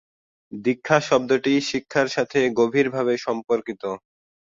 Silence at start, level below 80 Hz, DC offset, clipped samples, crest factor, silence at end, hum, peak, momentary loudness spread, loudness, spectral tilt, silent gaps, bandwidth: 0.5 s; -64 dBFS; under 0.1%; under 0.1%; 20 dB; 0.6 s; none; -2 dBFS; 11 LU; -22 LUFS; -5 dB/octave; none; 7.8 kHz